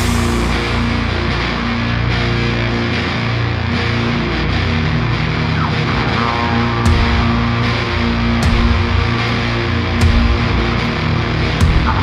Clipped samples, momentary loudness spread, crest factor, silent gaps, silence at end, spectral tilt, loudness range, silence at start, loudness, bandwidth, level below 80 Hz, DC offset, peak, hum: under 0.1%; 3 LU; 14 dB; none; 0 s; -6 dB/octave; 2 LU; 0 s; -16 LUFS; 13.5 kHz; -22 dBFS; under 0.1%; -2 dBFS; 60 Hz at -40 dBFS